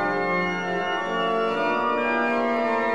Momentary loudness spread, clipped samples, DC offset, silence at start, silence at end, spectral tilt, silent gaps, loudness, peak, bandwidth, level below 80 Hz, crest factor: 3 LU; under 0.1%; 0.4%; 0 s; 0 s; -5.5 dB/octave; none; -24 LUFS; -12 dBFS; 10 kHz; -60 dBFS; 12 dB